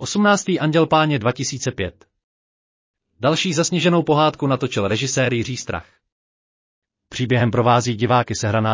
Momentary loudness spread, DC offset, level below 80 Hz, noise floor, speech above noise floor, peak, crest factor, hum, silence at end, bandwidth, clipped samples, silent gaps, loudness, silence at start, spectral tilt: 10 LU; under 0.1%; -48 dBFS; under -90 dBFS; over 72 dB; -4 dBFS; 16 dB; none; 0 s; 7.8 kHz; under 0.1%; 2.24-2.94 s, 6.12-6.82 s; -19 LUFS; 0 s; -5 dB/octave